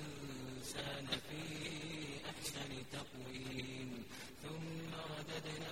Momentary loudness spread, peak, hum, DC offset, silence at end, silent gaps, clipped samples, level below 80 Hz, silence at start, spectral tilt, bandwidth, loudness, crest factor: 6 LU; -26 dBFS; none; 0.1%; 0 s; none; under 0.1%; -66 dBFS; 0 s; -4 dB/octave; 16 kHz; -46 LUFS; 22 dB